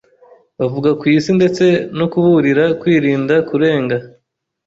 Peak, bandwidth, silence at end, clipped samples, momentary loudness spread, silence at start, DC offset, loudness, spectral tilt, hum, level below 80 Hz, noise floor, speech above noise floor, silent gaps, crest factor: -2 dBFS; 7.8 kHz; 0.55 s; under 0.1%; 7 LU; 0.6 s; under 0.1%; -14 LUFS; -7 dB/octave; none; -54 dBFS; -67 dBFS; 54 dB; none; 12 dB